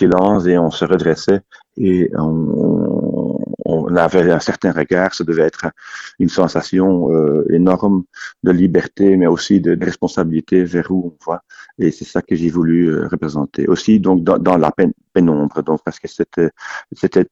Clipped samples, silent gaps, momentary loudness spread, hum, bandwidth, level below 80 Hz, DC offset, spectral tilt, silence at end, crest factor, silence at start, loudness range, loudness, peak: under 0.1%; none; 9 LU; none; 7.8 kHz; -46 dBFS; under 0.1%; -7 dB/octave; 0.05 s; 14 dB; 0 s; 3 LU; -15 LUFS; 0 dBFS